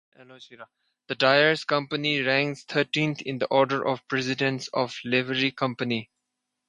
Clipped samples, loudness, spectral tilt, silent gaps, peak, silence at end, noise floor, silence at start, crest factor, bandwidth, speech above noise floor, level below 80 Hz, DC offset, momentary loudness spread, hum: under 0.1%; -25 LUFS; -5 dB/octave; none; -4 dBFS; 0.65 s; -82 dBFS; 0.2 s; 22 dB; 11 kHz; 56 dB; -72 dBFS; under 0.1%; 8 LU; none